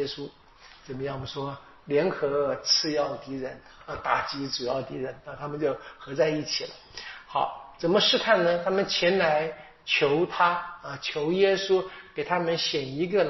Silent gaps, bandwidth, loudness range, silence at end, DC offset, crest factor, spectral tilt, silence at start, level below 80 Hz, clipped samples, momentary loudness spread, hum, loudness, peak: none; 6.2 kHz; 6 LU; 0 s; under 0.1%; 20 dB; -2.5 dB/octave; 0 s; -60 dBFS; under 0.1%; 15 LU; none; -26 LUFS; -8 dBFS